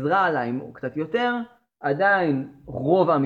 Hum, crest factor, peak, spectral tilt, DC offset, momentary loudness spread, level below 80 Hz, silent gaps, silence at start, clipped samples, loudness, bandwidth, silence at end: none; 16 dB; -6 dBFS; -8.5 dB/octave; under 0.1%; 12 LU; -60 dBFS; none; 0 s; under 0.1%; -23 LUFS; 7.2 kHz; 0 s